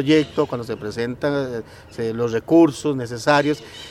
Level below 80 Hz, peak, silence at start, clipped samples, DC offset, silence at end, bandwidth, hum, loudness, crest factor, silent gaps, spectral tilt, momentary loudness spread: -52 dBFS; -2 dBFS; 0 s; under 0.1%; under 0.1%; 0 s; 13 kHz; none; -21 LUFS; 18 dB; none; -6 dB/octave; 13 LU